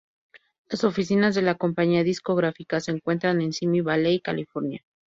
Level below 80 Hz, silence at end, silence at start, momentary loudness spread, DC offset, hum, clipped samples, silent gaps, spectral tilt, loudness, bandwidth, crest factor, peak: -64 dBFS; 0.3 s; 0.35 s; 8 LU; under 0.1%; none; under 0.1%; 0.58-0.65 s; -6.5 dB/octave; -24 LUFS; 8 kHz; 16 dB; -8 dBFS